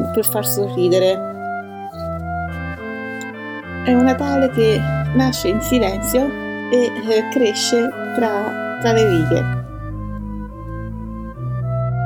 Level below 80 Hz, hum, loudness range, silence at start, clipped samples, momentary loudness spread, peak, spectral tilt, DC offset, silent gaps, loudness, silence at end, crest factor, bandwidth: -36 dBFS; none; 4 LU; 0 s; under 0.1%; 14 LU; -4 dBFS; -5.5 dB/octave; under 0.1%; none; -19 LUFS; 0 s; 16 dB; 19 kHz